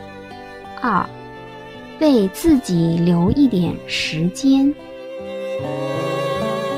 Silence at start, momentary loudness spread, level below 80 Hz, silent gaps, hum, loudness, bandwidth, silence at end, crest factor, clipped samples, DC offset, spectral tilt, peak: 0 s; 20 LU; -42 dBFS; none; none; -18 LUFS; 15.5 kHz; 0 s; 16 dB; under 0.1%; under 0.1%; -6.5 dB/octave; -4 dBFS